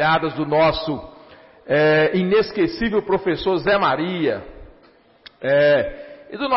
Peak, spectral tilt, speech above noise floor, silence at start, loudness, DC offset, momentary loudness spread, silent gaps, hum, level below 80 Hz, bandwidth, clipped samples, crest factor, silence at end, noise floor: -8 dBFS; -9.5 dB/octave; 34 dB; 0 s; -19 LUFS; under 0.1%; 13 LU; none; none; -46 dBFS; 5.8 kHz; under 0.1%; 12 dB; 0 s; -53 dBFS